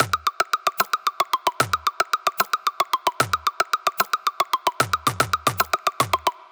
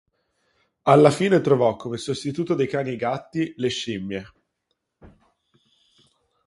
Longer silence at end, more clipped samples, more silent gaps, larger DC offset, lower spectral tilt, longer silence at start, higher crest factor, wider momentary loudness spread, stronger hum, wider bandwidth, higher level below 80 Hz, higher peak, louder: second, 0.2 s vs 1.4 s; neither; neither; neither; second, -2 dB/octave vs -6 dB/octave; second, 0 s vs 0.85 s; about the same, 20 dB vs 24 dB; second, 1 LU vs 14 LU; neither; first, over 20 kHz vs 11.5 kHz; about the same, -56 dBFS vs -60 dBFS; second, -4 dBFS vs 0 dBFS; about the same, -22 LUFS vs -22 LUFS